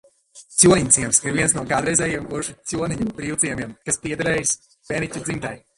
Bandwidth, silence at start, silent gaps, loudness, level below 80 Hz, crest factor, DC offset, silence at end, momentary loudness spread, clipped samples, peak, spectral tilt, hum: 12 kHz; 0.35 s; none; -20 LUFS; -48 dBFS; 22 dB; under 0.1%; 0.2 s; 13 LU; under 0.1%; 0 dBFS; -3.5 dB/octave; none